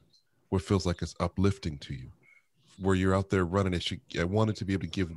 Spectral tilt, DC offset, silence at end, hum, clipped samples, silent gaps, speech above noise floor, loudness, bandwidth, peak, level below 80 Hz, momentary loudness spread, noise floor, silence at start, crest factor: -6.5 dB/octave; under 0.1%; 0 s; none; under 0.1%; none; 39 dB; -30 LUFS; 11.5 kHz; -12 dBFS; -50 dBFS; 11 LU; -68 dBFS; 0.5 s; 18 dB